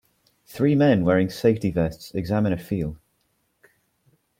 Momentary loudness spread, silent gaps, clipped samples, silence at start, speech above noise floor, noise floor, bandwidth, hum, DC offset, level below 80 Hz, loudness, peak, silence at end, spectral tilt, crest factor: 11 LU; none; under 0.1%; 0.5 s; 49 dB; -70 dBFS; 16.5 kHz; none; under 0.1%; -50 dBFS; -22 LUFS; -6 dBFS; 1.45 s; -8 dB/octave; 18 dB